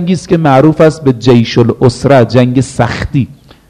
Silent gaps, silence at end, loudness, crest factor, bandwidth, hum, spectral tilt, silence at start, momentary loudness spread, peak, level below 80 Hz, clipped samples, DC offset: none; 0.35 s; -9 LUFS; 8 dB; 11 kHz; none; -7 dB/octave; 0 s; 7 LU; 0 dBFS; -34 dBFS; 3%; under 0.1%